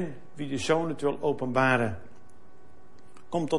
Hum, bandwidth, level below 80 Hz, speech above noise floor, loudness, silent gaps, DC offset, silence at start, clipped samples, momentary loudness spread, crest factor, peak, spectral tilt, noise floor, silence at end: none; 11.5 kHz; -62 dBFS; 30 dB; -28 LUFS; none; 1%; 0 s; under 0.1%; 13 LU; 22 dB; -8 dBFS; -5.5 dB/octave; -57 dBFS; 0 s